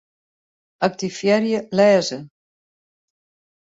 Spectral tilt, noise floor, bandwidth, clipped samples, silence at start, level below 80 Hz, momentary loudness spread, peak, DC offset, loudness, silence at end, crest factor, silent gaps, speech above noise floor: -5 dB/octave; under -90 dBFS; 8 kHz; under 0.1%; 0.8 s; -66 dBFS; 10 LU; -4 dBFS; under 0.1%; -19 LUFS; 1.35 s; 20 dB; none; over 72 dB